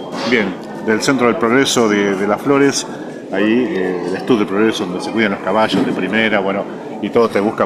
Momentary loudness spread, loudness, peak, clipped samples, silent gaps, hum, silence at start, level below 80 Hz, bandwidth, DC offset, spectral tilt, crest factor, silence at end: 9 LU; -16 LUFS; 0 dBFS; under 0.1%; none; none; 0 s; -58 dBFS; 15 kHz; under 0.1%; -4.5 dB/octave; 16 dB; 0 s